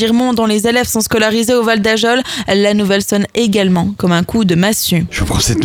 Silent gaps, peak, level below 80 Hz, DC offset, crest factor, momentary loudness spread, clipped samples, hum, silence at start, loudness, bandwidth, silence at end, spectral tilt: none; 0 dBFS; -34 dBFS; under 0.1%; 12 dB; 3 LU; under 0.1%; none; 0 s; -13 LUFS; 19.5 kHz; 0 s; -4.5 dB/octave